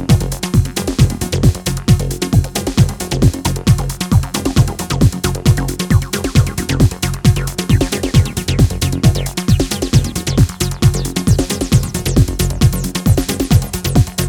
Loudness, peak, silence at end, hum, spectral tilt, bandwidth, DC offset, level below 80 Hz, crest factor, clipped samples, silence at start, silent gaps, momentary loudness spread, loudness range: -15 LUFS; 0 dBFS; 0 s; none; -5.5 dB/octave; 19.5 kHz; under 0.1%; -22 dBFS; 14 dB; under 0.1%; 0 s; none; 2 LU; 1 LU